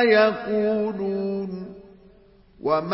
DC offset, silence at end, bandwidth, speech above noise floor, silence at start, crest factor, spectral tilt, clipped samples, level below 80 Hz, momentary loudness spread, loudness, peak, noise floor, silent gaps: under 0.1%; 0 s; 5.8 kHz; 31 dB; 0 s; 18 dB; -10 dB/octave; under 0.1%; -60 dBFS; 15 LU; -24 LUFS; -6 dBFS; -53 dBFS; none